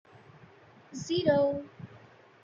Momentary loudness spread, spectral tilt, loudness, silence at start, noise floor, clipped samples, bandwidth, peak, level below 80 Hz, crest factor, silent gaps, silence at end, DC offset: 23 LU; -5.5 dB/octave; -29 LUFS; 0.9 s; -56 dBFS; under 0.1%; 7.6 kHz; -12 dBFS; -70 dBFS; 20 dB; none; 0.45 s; under 0.1%